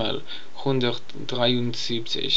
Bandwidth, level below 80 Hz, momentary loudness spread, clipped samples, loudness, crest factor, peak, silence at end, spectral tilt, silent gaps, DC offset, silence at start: 8 kHz; -68 dBFS; 10 LU; under 0.1%; -26 LUFS; 18 dB; -6 dBFS; 0 s; -5 dB/octave; none; 4%; 0 s